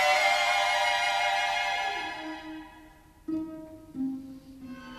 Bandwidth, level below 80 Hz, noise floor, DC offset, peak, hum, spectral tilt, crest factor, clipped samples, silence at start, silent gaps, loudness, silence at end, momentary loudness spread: 14 kHz; -62 dBFS; -54 dBFS; under 0.1%; -12 dBFS; none; -1.5 dB/octave; 18 dB; under 0.1%; 0 s; none; -27 LUFS; 0 s; 21 LU